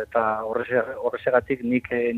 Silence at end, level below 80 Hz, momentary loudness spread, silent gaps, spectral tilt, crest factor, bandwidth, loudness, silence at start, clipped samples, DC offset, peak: 0 s; -58 dBFS; 4 LU; none; -8 dB/octave; 20 dB; 4.4 kHz; -24 LUFS; 0 s; under 0.1%; under 0.1%; -4 dBFS